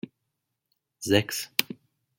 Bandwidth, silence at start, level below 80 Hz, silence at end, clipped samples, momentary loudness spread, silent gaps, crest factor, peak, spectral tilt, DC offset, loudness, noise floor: 17 kHz; 1 s; -68 dBFS; 0.45 s; under 0.1%; 20 LU; none; 30 dB; 0 dBFS; -3.5 dB/octave; under 0.1%; -26 LUFS; -81 dBFS